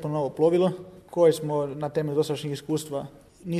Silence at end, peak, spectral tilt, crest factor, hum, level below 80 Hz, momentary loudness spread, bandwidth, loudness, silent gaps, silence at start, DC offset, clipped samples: 0 s; -8 dBFS; -6.5 dB/octave; 16 dB; none; -62 dBFS; 13 LU; 13.5 kHz; -26 LUFS; none; 0 s; under 0.1%; under 0.1%